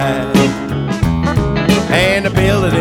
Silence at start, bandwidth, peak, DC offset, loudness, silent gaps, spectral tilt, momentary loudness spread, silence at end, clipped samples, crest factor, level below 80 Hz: 0 s; 18.5 kHz; 0 dBFS; under 0.1%; -14 LUFS; none; -6 dB/octave; 4 LU; 0 s; under 0.1%; 12 dB; -28 dBFS